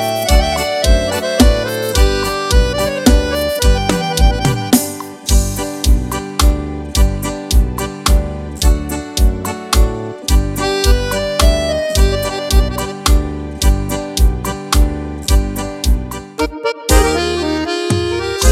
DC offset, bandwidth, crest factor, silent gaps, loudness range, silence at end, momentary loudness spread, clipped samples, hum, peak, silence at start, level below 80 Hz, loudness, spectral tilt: under 0.1%; 16 kHz; 14 dB; none; 3 LU; 0 s; 7 LU; under 0.1%; none; 0 dBFS; 0 s; -16 dBFS; -16 LUFS; -4.5 dB/octave